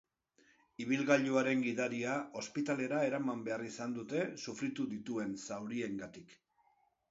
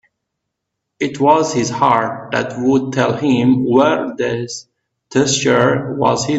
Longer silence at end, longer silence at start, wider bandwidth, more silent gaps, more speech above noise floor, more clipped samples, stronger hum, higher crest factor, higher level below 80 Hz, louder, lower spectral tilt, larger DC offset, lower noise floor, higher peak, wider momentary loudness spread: first, 0.75 s vs 0 s; second, 0.8 s vs 1 s; about the same, 7.6 kHz vs 8.2 kHz; neither; second, 38 dB vs 62 dB; neither; neither; first, 22 dB vs 16 dB; second, -78 dBFS vs -54 dBFS; second, -37 LUFS vs -15 LUFS; about the same, -4.5 dB/octave vs -5 dB/octave; neither; about the same, -74 dBFS vs -77 dBFS; second, -14 dBFS vs 0 dBFS; first, 11 LU vs 8 LU